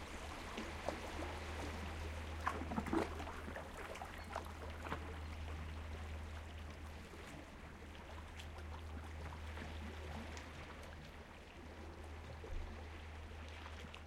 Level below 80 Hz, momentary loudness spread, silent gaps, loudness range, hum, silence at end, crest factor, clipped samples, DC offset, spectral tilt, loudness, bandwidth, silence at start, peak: -52 dBFS; 10 LU; none; 7 LU; none; 0 s; 24 dB; under 0.1%; under 0.1%; -5.5 dB/octave; -48 LUFS; 15.5 kHz; 0 s; -22 dBFS